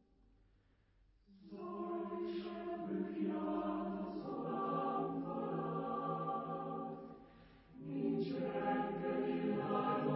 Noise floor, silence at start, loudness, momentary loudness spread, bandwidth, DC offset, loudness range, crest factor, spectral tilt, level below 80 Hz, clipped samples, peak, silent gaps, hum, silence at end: -72 dBFS; 1.3 s; -41 LUFS; 10 LU; 5.6 kHz; under 0.1%; 3 LU; 18 dB; -6.5 dB/octave; -72 dBFS; under 0.1%; -24 dBFS; none; none; 0 s